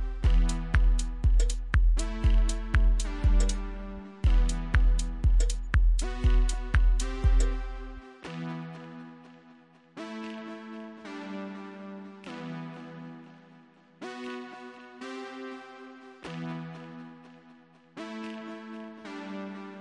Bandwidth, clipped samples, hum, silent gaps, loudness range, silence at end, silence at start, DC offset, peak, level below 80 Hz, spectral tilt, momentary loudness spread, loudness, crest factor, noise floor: 11 kHz; under 0.1%; none; none; 14 LU; 0 s; 0 s; under 0.1%; -8 dBFS; -28 dBFS; -5.5 dB/octave; 18 LU; -31 LUFS; 20 dB; -57 dBFS